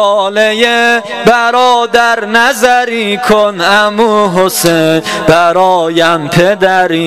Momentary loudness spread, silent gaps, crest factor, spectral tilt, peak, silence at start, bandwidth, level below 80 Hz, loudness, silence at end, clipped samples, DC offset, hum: 2 LU; none; 8 dB; -4 dB/octave; 0 dBFS; 0 s; 16 kHz; -44 dBFS; -8 LUFS; 0 s; 0.5%; 0.9%; none